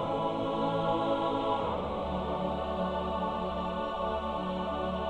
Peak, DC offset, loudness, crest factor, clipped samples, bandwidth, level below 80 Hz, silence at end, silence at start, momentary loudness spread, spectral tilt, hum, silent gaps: -18 dBFS; under 0.1%; -32 LUFS; 14 dB; under 0.1%; 10.5 kHz; -48 dBFS; 0 s; 0 s; 4 LU; -7.5 dB/octave; none; none